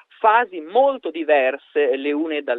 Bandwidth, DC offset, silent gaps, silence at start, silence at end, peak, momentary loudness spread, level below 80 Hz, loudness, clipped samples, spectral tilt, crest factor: 4.1 kHz; under 0.1%; none; 0.2 s; 0 s; -2 dBFS; 6 LU; -76 dBFS; -19 LUFS; under 0.1%; -6 dB/octave; 18 dB